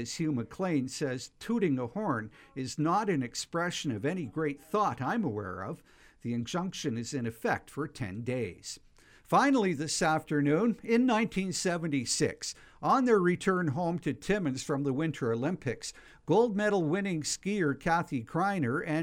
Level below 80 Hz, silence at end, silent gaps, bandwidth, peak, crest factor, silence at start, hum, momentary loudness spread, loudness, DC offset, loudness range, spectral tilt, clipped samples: -60 dBFS; 0 s; none; 16.5 kHz; -14 dBFS; 18 dB; 0 s; none; 11 LU; -31 LUFS; under 0.1%; 5 LU; -5 dB/octave; under 0.1%